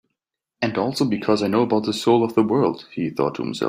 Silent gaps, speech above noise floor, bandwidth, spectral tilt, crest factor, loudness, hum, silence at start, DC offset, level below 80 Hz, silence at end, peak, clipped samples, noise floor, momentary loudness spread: none; 61 dB; 15.5 kHz; -6 dB/octave; 16 dB; -21 LUFS; none; 0.6 s; under 0.1%; -62 dBFS; 0 s; -4 dBFS; under 0.1%; -81 dBFS; 7 LU